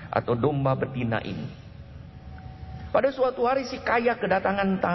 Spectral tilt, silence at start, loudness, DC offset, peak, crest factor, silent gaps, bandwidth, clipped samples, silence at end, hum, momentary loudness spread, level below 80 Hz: -7.5 dB/octave; 0 s; -25 LUFS; under 0.1%; -8 dBFS; 20 dB; none; 6.2 kHz; under 0.1%; 0 s; none; 20 LU; -48 dBFS